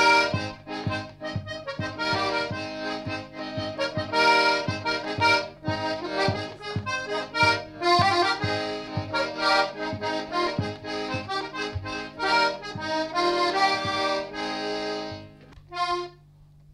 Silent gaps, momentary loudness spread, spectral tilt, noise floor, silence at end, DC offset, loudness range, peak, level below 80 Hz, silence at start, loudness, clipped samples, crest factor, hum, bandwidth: none; 12 LU; -4.5 dB/octave; -53 dBFS; 0.3 s; under 0.1%; 4 LU; -10 dBFS; -56 dBFS; 0 s; -26 LUFS; under 0.1%; 18 dB; 50 Hz at -60 dBFS; 14 kHz